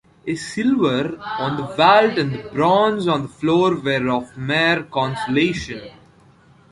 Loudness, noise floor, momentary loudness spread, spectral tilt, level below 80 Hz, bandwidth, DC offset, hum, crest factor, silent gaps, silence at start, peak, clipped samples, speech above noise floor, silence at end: -19 LUFS; -51 dBFS; 11 LU; -6 dB/octave; -52 dBFS; 11.5 kHz; under 0.1%; none; 18 dB; none; 0.25 s; -2 dBFS; under 0.1%; 32 dB; 0.8 s